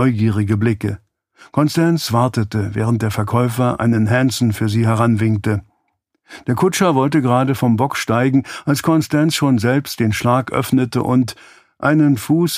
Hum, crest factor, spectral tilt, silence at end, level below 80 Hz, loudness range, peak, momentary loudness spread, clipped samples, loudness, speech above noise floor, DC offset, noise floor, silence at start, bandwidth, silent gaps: none; 16 dB; -6.5 dB/octave; 0 s; -50 dBFS; 2 LU; 0 dBFS; 5 LU; under 0.1%; -17 LUFS; 52 dB; under 0.1%; -68 dBFS; 0 s; 15.5 kHz; none